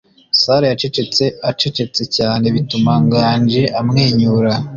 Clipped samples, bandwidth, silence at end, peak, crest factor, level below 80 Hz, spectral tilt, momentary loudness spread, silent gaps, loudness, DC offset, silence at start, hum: under 0.1%; 7.4 kHz; 0 s; -2 dBFS; 14 dB; -46 dBFS; -6 dB/octave; 5 LU; none; -14 LUFS; under 0.1%; 0.35 s; none